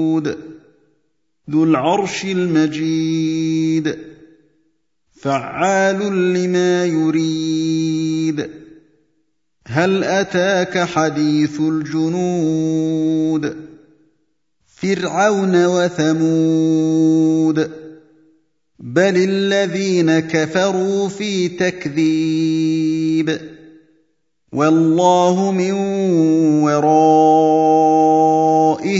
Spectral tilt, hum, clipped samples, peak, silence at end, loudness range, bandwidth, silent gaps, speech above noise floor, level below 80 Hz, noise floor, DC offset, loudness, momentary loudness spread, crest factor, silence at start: -6 dB/octave; none; under 0.1%; 0 dBFS; 0 s; 6 LU; 7.8 kHz; none; 53 dB; -60 dBFS; -69 dBFS; under 0.1%; -16 LUFS; 8 LU; 16 dB; 0 s